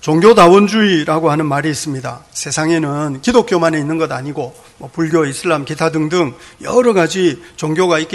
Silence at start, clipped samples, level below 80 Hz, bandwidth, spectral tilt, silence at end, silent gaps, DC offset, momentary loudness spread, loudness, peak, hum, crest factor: 0.05 s; 0.5%; -48 dBFS; 12.5 kHz; -5 dB/octave; 0 s; none; under 0.1%; 15 LU; -14 LUFS; 0 dBFS; none; 14 dB